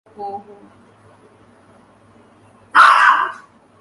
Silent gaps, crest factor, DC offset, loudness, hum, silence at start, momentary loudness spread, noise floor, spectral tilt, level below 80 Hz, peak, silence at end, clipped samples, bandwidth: none; 18 dB; under 0.1%; -12 LUFS; none; 0.2 s; 22 LU; -49 dBFS; -1 dB/octave; -68 dBFS; 0 dBFS; 0.45 s; under 0.1%; 11.5 kHz